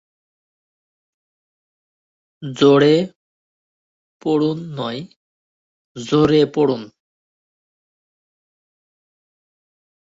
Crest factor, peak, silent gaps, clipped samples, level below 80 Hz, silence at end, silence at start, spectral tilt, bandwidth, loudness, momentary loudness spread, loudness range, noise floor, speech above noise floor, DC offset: 20 dB; -2 dBFS; 3.16-4.20 s, 5.16-5.95 s; under 0.1%; -58 dBFS; 3.2 s; 2.4 s; -6.5 dB/octave; 7.8 kHz; -17 LUFS; 18 LU; 5 LU; under -90 dBFS; over 74 dB; under 0.1%